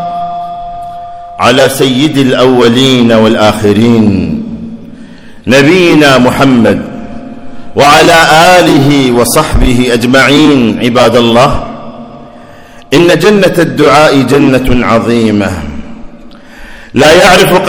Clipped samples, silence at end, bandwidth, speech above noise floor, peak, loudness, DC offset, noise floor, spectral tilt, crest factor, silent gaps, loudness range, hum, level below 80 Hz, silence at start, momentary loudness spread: 9%; 0 s; over 20 kHz; 26 dB; 0 dBFS; -6 LUFS; under 0.1%; -31 dBFS; -5 dB/octave; 6 dB; none; 3 LU; none; -24 dBFS; 0 s; 19 LU